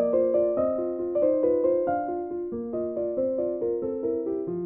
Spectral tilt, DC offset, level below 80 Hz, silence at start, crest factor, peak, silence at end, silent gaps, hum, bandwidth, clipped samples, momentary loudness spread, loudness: -10 dB/octave; under 0.1%; -60 dBFS; 0 s; 14 dB; -12 dBFS; 0 s; none; none; 2.8 kHz; under 0.1%; 8 LU; -26 LUFS